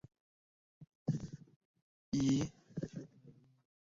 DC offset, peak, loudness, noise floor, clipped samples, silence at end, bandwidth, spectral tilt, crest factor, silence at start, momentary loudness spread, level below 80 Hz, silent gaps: under 0.1%; -24 dBFS; -39 LUFS; -63 dBFS; under 0.1%; 0.7 s; 7.6 kHz; -7.5 dB/octave; 18 dB; 0.8 s; 18 LU; -66 dBFS; 0.95-1.06 s, 1.56-1.74 s, 1.82-2.12 s